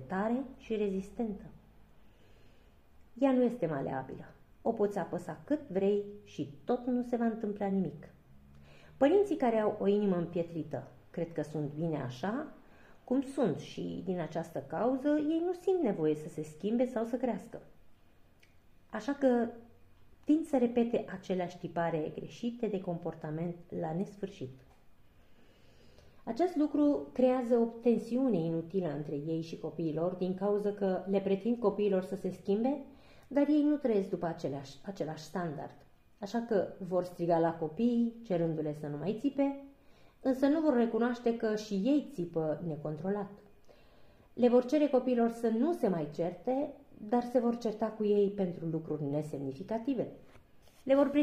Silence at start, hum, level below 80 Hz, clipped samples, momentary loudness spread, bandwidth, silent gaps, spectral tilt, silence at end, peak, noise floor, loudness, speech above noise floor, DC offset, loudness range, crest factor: 0 s; none; -66 dBFS; under 0.1%; 12 LU; 13.5 kHz; none; -8 dB/octave; 0 s; -14 dBFS; -61 dBFS; -33 LUFS; 29 dB; under 0.1%; 5 LU; 20 dB